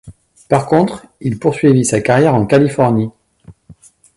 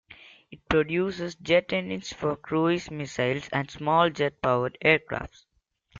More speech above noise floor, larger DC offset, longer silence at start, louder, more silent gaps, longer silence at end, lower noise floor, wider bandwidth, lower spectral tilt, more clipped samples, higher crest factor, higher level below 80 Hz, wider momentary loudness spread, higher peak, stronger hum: first, 31 dB vs 27 dB; neither; about the same, 0.05 s vs 0.1 s; first, -14 LUFS vs -26 LUFS; neither; first, 0.65 s vs 0 s; second, -44 dBFS vs -54 dBFS; first, 11.5 kHz vs 7.6 kHz; about the same, -6.5 dB/octave vs -5.5 dB/octave; neither; second, 14 dB vs 22 dB; first, -46 dBFS vs -54 dBFS; second, 9 LU vs 12 LU; first, 0 dBFS vs -6 dBFS; neither